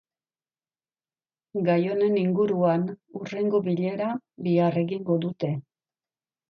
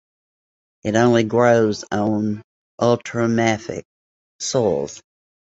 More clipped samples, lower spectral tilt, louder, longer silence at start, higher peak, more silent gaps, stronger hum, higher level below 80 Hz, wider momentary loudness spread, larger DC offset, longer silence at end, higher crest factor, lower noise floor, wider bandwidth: neither; first, -9.5 dB/octave vs -5.5 dB/octave; second, -26 LUFS vs -19 LUFS; first, 1.55 s vs 0.85 s; second, -10 dBFS vs -2 dBFS; second, none vs 2.44-2.78 s, 3.85-4.39 s; neither; second, -72 dBFS vs -54 dBFS; second, 10 LU vs 14 LU; neither; first, 0.9 s vs 0.6 s; about the same, 16 dB vs 18 dB; about the same, under -90 dBFS vs under -90 dBFS; second, 6.6 kHz vs 8 kHz